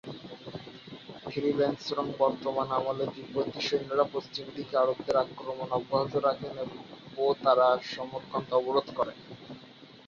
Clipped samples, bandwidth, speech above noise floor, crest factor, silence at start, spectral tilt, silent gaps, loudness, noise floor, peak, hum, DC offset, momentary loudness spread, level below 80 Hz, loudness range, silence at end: under 0.1%; 7.2 kHz; 22 dB; 20 dB; 0.05 s; -6 dB/octave; none; -30 LUFS; -52 dBFS; -10 dBFS; none; under 0.1%; 17 LU; -68 dBFS; 2 LU; 0.05 s